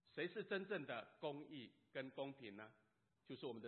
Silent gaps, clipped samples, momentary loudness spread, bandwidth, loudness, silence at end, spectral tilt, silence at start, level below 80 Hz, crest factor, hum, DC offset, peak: none; under 0.1%; 12 LU; 4.3 kHz; -51 LUFS; 0 s; -3.5 dB/octave; 0.05 s; under -90 dBFS; 18 dB; none; under 0.1%; -32 dBFS